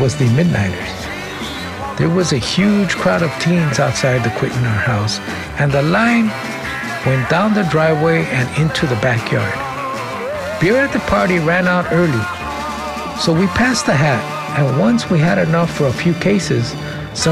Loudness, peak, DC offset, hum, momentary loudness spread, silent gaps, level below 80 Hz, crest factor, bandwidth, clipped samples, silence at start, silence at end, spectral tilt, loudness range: -16 LUFS; -2 dBFS; under 0.1%; none; 9 LU; none; -40 dBFS; 14 dB; 15.5 kHz; under 0.1%; 0 s; 0 s; -5.5 dB/octave; 2 LU